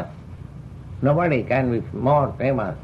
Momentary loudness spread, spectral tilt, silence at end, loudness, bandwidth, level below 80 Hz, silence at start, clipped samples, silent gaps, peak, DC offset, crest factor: 19 LU; -10 dB/octave; 0 s; -21 LUFS; 5.6 kHz; -46 dBFS; 0 s; under 0.1%; none; -8 dBFS; under 0.1%; 14 dB